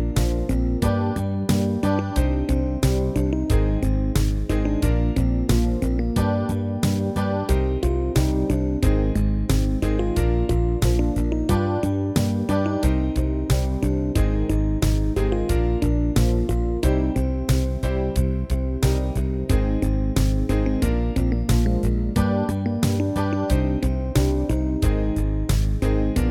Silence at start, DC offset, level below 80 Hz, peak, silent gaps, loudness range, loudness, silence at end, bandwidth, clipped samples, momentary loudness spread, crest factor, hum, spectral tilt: 0 s; under 0.1%; -24 dBFS; -6 dBFS; none; 1 LU; -22 LUFS; 0 s; 16 kHz; under 0.1%; 2 LU; 14 dB; none; -7 dB/octave